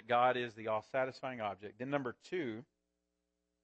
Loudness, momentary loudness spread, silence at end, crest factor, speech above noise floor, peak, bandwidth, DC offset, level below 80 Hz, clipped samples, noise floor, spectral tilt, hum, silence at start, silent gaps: -38 LUFS; 11 LU; 1 s; 20 dB; 49 dB; -18 dBFS; 8.4 kHz; under 0.1%; -82 dBFS; under 0.1%; -86 dBFS; -6 dB/octave; none; 0.05 s; none